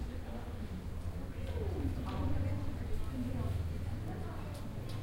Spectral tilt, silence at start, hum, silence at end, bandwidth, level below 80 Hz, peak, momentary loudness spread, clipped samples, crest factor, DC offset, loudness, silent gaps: -7.5 dB/octave; 0 s; none; 0 s; 16.5 kHz; -44 dBFS; -24 dBFS; 6 LU; under 0.1%; 14 dB; under 0.1%; -40 LUFS; none